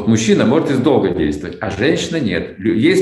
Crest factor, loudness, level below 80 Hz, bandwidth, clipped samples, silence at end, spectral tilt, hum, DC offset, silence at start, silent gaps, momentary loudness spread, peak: 14 dB; -16 LUFS; -44 dBFS; 12 kHz; under 0.1%; 0 s; -5.5 dB/octave; none; under 0.1%; 0 s; none; 7 LU; 0 dBFS